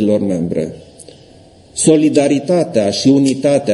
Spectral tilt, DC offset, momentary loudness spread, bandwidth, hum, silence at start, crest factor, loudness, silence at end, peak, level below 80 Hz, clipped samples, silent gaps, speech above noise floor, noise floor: -5.5 dB/octave; under 0.1%; 9 LU; 11.5 kHz; none; 0 s; 14 dB; -14 LUFS; 0 s; 0 dBFS; -52 dBFS; under 0.1%; none; 30 dB; -43 dBFS